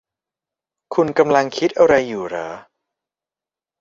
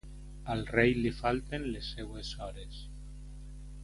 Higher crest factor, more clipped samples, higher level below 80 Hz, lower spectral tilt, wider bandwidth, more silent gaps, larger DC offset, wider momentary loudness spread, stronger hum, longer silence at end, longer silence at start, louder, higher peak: about the same, 20 dB vs 24 dB; neither; second, -56 dBFS vs -46 dBFS; about the same, -5.5 dB/octave vs -6 dB/octave; second, 7.6 kHz vs 11.5 kHz; neither; neither; second, 14 LU vs 21 LU; second, none vs 50 Hz at -45 dBFS; first, 1.2 s vs 0 s; first, 0.9 s vs 0.05 s; first, -17 LUFS vs -33 LUFS; first, -2 dBFS vs -10 dBFS